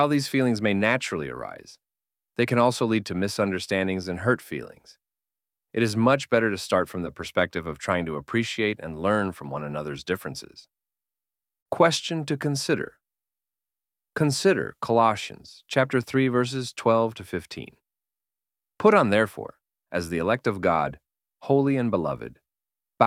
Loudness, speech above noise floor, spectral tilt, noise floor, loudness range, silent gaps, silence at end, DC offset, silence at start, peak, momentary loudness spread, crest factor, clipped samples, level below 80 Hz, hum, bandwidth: -25 LUFS; over 65 dB; -5.5 dB/octave; under -90 dBFS; 3 LU; 11.62-11.66 s; 0 s; under 0.1%; 0 s; -2 dBFS; 15 LU; 22 dB; under 0.1%; -58 dBFS; none; 16 kHz